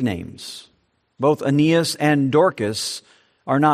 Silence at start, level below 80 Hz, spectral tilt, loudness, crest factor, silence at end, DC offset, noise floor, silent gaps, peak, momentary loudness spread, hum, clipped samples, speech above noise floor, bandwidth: 0 s; -60 dBFS; -5.5 dB/octave; -19 LUFS; 16 dB; 0 s; under 0.1%; -65 dBFS; none; -4 dBFS; 18 LU; none; under 0.1%; 45 dB; 14 kHz